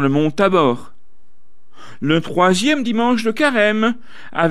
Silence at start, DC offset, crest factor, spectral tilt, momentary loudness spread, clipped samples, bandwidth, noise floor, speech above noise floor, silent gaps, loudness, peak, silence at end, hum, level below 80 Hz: 0 s; 3%; 16 dB; -5.5 dB/octave; 10 LU; under 0.1%; 14 kHz; -62 dBFS; 46 dB; none; -17 LUFS; -2 dBFS; 0 s; none; -56 dBFS